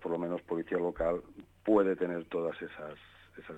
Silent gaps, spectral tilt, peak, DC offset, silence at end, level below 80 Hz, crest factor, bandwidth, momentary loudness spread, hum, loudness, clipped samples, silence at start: none; -8.5 dB/octave; -16 dBFS; under 0.1%; 0 s; -60 dBFS; 18 dB; 8.2 kHz; 19 LU; none; -33 LUFS; under 0.1%; 0 s